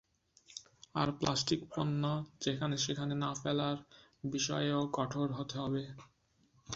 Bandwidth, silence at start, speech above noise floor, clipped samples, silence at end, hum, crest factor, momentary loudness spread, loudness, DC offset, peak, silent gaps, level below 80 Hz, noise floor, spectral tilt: 8 kHz; 0.5 s; 36 dB; under 0.1%; 0 s; none; 20 dB; 13 LU; -36 LUFS; under 0.1%; -16 dBFS; none; -66 dBFS; -71 dBFS; -5 dB/octave